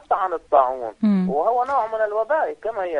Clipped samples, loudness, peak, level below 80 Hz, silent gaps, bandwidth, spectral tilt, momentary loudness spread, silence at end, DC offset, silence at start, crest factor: under 0.1%; -21 LUFS; -4 dBFS; -58 dBFS; none; 7.4 kHz; -9 dB/octave; 5 LU; 0 s; under 0.1%; 0.1 s; 18 dB